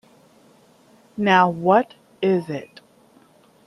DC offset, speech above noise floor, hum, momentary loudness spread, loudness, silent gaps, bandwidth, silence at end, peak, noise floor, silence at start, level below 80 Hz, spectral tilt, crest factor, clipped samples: under 0.1%; 36 dB; none; 16 LU; -19 LUFS; none; 11.5 kHz; 1 s; -2 dBFS; -54 dBFS; 1.15 s; -68 dBFS; -7 dB/octave; 20 dB; under 0.1%